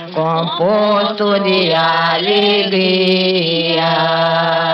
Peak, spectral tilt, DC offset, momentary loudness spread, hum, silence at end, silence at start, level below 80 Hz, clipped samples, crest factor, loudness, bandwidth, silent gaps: -2 dBFS; -7 dB/octave; under 0.1%; 2 LU; none; 0 s; 0 s; -64 dBFS; under 0.1%; 12 dB; -13 LUFS; 6.2 kHz; none